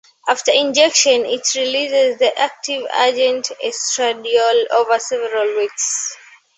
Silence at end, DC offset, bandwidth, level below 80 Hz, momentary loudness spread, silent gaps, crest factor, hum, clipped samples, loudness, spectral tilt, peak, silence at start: 0.4 s; under 0.1%; 8.4 kHz; -70 dBFS; 8 LU; none; 16 dB; none; under 0.1%; -16 LUFS; 0.5 dB/octave; 0 dBFS; 0.25 s